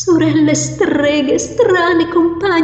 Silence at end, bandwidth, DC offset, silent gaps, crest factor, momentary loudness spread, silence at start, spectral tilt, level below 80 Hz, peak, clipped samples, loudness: 0 s; 9 kHz; under 0.1%; none; 12 dB; 3 LU; 0 s; -4.5 dB/octave; -44 dBFS; -2 dBFS; under 0.1%; -13 LUFS